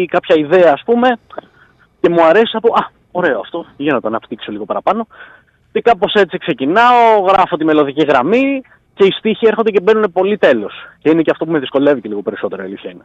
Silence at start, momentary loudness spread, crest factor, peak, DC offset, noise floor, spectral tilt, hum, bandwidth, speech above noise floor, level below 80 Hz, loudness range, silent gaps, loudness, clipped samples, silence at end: 0 s; 13 LU; 12 dB; -2 dBFS; under 0.1%; -49 dBFS; -6.5 dB/octave; none; 7.8 kHz; 37 dB; -54 dBFS; 5 LU; none; -13 LUFS; under 0.1%; 0.05 s